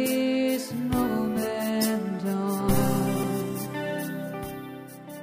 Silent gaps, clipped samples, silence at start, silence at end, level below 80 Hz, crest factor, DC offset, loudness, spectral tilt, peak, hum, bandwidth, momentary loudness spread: none; under 0.1%; 0 s; 0 s; -48 dBFS; 16 dB; under 0.1%; -27 LUFS; -5.5 dB/octave; -10 dBFS; none; 15.5 kHz; 11 LU